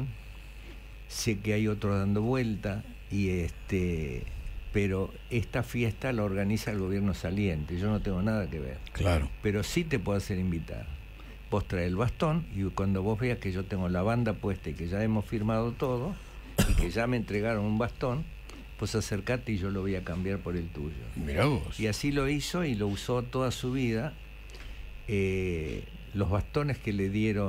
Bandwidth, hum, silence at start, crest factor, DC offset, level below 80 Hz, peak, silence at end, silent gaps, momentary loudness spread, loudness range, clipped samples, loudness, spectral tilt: 16 kHz; none; 0 s; 18 dB; under 0.1%; -40 dBFS; -12 dBFS; 0 s; none; 11 LU; 2 LU; under 0.1%; -31 LUFS; -6.5 dB/octave